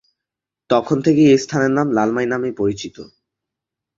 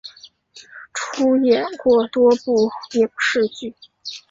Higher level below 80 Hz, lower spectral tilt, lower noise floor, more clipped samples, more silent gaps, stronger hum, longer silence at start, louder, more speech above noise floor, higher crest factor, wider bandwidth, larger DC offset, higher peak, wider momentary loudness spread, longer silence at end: about the same, -56 dBFS vs -60 dBFS; first, -6 dB/octave vs -4 dB/octave; first, -85 dBFS vs -46 dBFS; neither; neither; neither; first, 0.7 s vs 0.05 s; about the same, -17 LUFS vs -18 LUFS; first, 69 dB vs 28 dB; about the same, 16 dB vs 16 dB; about the same, 7.8 kHz vs 7.8 kHz; neither; about the same, -2 dBFS vs -4 dBFS; second, 9 LU vs 18 LU; first, 0.95 s vs 0.1 s